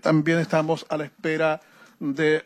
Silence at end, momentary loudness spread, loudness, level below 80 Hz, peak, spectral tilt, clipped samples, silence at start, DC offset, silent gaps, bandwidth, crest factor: 0.05 s; 10 LU; -24 LUFS; -72 dBFS; -10 dBFS; -6.5 dB/octave; under 0.1%; 0.05 s; under 0.1%; none; 12.5 kHz; 14 dB